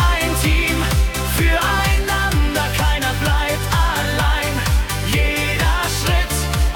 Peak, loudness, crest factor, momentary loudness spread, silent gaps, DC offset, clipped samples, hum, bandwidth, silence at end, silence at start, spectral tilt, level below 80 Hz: -4 dBFS; -18 LUFS; 12 dB; 2 LU; none; under 0.1%; under 0.1%; none; 18 kHz; 0 s; 0 s; -4 dB/octave; -20 dBFS